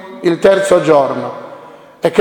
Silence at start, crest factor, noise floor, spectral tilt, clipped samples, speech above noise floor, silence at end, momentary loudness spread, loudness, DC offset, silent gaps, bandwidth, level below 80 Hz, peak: 0 s; 14 dB; -36 dBFS; -5.5 dB/octave; 0.2%; 25 dB; 0 s; 17 LU; -12 LUFS; under 0.1%; none; 17 kHz; -52 dBFS; 0 dBFS